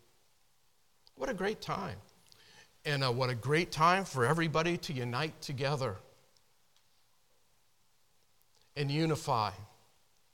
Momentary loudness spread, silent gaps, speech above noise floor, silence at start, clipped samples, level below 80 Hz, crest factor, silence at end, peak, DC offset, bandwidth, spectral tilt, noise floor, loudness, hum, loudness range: 14 LU; none; 41 dB; 1.15 s; under 0.1%; -62 dBFS; 22 dB; 0.65 s; -14 dBFS; under 0.1%; 18 kHz; -5.5 dB/octave; -74 dBFS; -33 LUFS; none; 10 LU